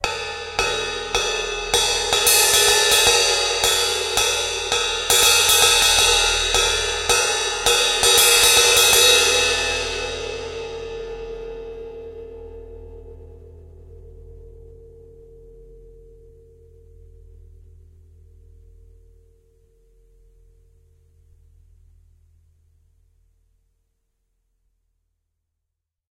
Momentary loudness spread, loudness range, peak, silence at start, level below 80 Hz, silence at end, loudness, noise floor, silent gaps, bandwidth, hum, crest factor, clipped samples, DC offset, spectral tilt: 21 LU; 20 LU; 0 dBFS; 0 s; -42 dBFS; 10.4 s; -15 LUFS; -81 dBFS; none; 16 kHz; none; 22 dB; under 0.1%; under 0.1%; 0.5 dB/octave